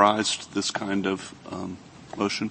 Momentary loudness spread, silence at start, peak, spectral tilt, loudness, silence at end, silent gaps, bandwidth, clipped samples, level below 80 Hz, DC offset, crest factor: 12 LU; 0 s; -2 dBFS; -3.5 dB/octave; -28 LUFS; 0 s; none; 8.8 kHz; under 0.1%; -64 dBFS; under 0.1%; 24 dB